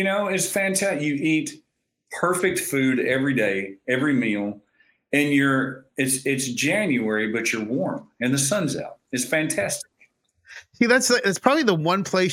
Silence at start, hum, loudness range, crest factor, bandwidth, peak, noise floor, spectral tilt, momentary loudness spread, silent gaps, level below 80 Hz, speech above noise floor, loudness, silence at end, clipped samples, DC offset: 0 s; none; 2 LU; 22 dB; 17 kHz; -2 dBFS; -61 dBFS; -4 dB/octave; 9 LU; none; -66 dBFS; 39 dB; -22 LUFS; 0 s; under 0.1%; under 0.1%